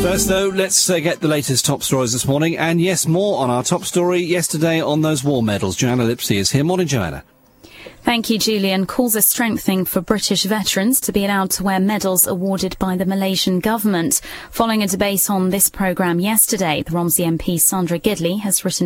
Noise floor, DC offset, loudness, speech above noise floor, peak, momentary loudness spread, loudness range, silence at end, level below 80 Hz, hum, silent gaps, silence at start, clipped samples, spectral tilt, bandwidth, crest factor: -43 dBFS; under 0.1%; -17 LUFS; 26 dB; 0 dBFS; 5 LU; 2 LU; 0 s; -44 dBFS; none; none; 0 s; under 0.1%; -4 dB/octave; 16.5 kHz; 18 dB